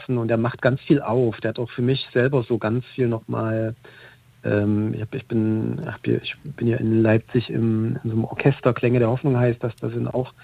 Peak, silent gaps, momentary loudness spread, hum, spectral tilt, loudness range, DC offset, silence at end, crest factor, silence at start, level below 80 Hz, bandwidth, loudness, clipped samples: -4 dBFS; none; 8 LU; none; -9.5 dB/octave; 4 LU; under 0.1%; 0.15 s; 18 dB; 0 s; -54 dBFS; 4.9 kHz; -22 LUFS; under 0.1%